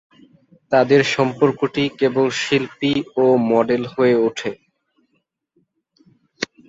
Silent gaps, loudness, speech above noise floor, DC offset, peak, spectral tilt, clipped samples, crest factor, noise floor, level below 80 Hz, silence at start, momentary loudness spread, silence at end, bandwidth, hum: none; -18 LUFS; 52 dB; under 0.1%; -2 dBFS; -5.5 dB/octave; under 0.1%; 18 dB; -70 dBFS; -60 dBFS; 0.7 s; 7 LU; 0.25 s; 8 kHz; none